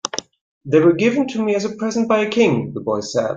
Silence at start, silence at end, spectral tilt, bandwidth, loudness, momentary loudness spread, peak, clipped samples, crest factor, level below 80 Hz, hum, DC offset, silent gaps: 0.05 s; 0 s; -5.5 dB/octave; 8.8 kHz; -18 LUFS; 8 LU; -2 dBFS; under 0.1%; 16 dB; -60 dBFS; none; under 0.1%; 0.41-0.61 s